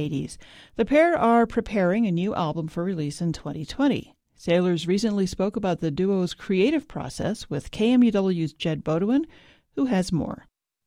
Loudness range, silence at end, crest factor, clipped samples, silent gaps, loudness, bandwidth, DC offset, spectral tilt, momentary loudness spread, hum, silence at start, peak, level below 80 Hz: 2 LU; 0.5 s; 18 dB; under 0.1%; none; -24 LUFS; 12.5 kHz; under 0.1%; -6.5 dB/octave; 13 LU; none; 0 s; -6 dBFS; -50 dBFS